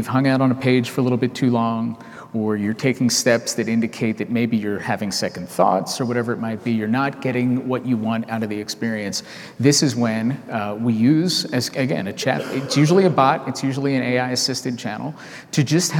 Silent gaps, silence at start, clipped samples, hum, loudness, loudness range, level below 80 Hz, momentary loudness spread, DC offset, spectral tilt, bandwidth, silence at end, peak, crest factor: none; 0 s; under 0.1%; none; -20 LUFS; 3 LU; -68 dBFS; 9 LU; under 0.1%; -5 dB/octave; 17 kHz; 0 s; -2 dBFS; 18 dB